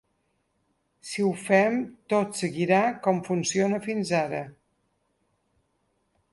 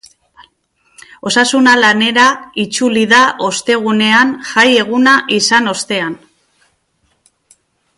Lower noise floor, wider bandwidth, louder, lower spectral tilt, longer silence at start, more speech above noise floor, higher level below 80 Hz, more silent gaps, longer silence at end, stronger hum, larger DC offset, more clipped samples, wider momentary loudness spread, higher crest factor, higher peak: first, -73 dBFS vs -61 dBFS; about the same, 11.5 kHz vs 11.5 kHz; second, -25 LUFS vs -11 LUFS; first, -5 dB/octave vs -2.5 dB/octave; second, 1.05 s vs 1.25 s; about the same, 48 dB vs 50 dB; second, -70 dBFS vs -60 dBFS; neither; about the same, 1.8 s vs 1.8 s; neither; neither; neither; about the same, 11 LU vs 9 LU; first, 22 dB vs 14 dB; second, -6 dBFS vs 0 dBFS